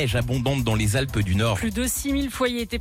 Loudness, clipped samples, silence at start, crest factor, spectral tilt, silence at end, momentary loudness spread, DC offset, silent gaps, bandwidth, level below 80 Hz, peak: -23 LUFS; under 0.1%; 0 s; 12 dB; -5 dB/octave; 0 s; 2 LU; under 0.1%; none; 17 kHz; -36 dBFS; -12 dBFS